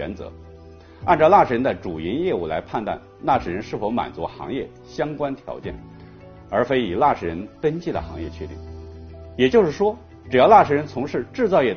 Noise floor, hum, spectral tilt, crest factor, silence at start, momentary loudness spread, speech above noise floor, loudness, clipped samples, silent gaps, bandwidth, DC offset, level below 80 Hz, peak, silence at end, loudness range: -44 dBFS; none; -4.5 dB/octave; 20 dB; 0 s; 21 LU; 23 dB; -21 LUFS; under 0.1%; none; 6.8 kHz; under 0.1%; -46 dBFS; -2 dBFS; 0 s; 7 LU